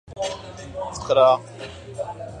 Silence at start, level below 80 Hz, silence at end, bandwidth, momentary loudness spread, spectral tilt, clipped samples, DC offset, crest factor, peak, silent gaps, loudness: 0.05 s; -50 dBFS; 0 s; 10 kHz; 19 LU; -4 dB/octave; under 0.1%; under 0.1%; 18 dB; -4 dBFS; none; -22 LUFS